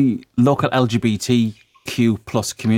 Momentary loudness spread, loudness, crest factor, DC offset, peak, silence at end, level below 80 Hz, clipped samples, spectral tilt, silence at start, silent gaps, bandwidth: 7 LU; -19 LUFS; 16 dB; under 0.1%; -2 dBFS; 0 s; -52 dBFS; under 0.1%; -6 dB/octave; 0 s; none; 16 kHz